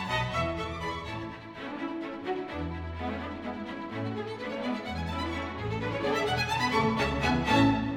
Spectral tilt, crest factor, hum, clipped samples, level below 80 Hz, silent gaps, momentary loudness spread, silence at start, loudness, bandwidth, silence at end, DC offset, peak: -5.5 dB/octave; 20 dB; none; under 0.1%; -46 dBFS; none; 11 LU; 0 s; -31 LUFS; 16.5 kHz; 0 s; under 0.1%; -12 dBFS